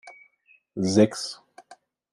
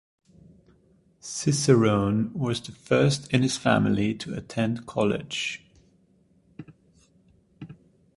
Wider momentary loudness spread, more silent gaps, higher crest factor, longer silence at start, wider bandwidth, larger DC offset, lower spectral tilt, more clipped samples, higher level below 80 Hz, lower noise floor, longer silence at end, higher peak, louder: second, 20 LU vs 25 LU; neither; about the same, 22 dB vs 22 dB; second, 0.05 s vs 1.25 s; about the same, 12 kHz vs 11.5 kHz; neither; about the same, -5.5 dB/octave vs -5.5 dB/octave; neither; second, -70 dBFS vs -56 dBFS; about the same, -62 dBFS vs -62 dBFS; about the same, 0.4 s vs 0.45 s; about the same, -4 dBFS vs -4 dBFS; about the same, -24 LUFS vs -25 LUFS